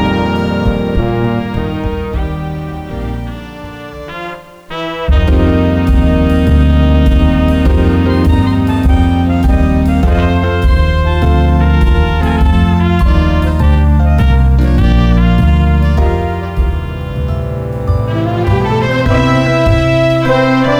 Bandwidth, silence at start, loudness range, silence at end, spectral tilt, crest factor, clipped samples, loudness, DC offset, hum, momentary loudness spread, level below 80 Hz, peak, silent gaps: 9 kHz; 0 s; 7 LU; 0 s; -8 dB/octave; 10 dB; under 0.1%; -12 LUFS; under 0.1%; none; 11 LU; -14 dBFS; 0 dBFS; none